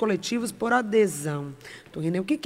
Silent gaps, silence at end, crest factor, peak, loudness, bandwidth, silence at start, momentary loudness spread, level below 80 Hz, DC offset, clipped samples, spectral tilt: none; 0.05 s; 18 dB; -8 dBFS; -26 LUFS; 16 kHz; 0 s; 16 LU; -64 dBFS; under 0.1%; under 0.1%; -5 dB/octave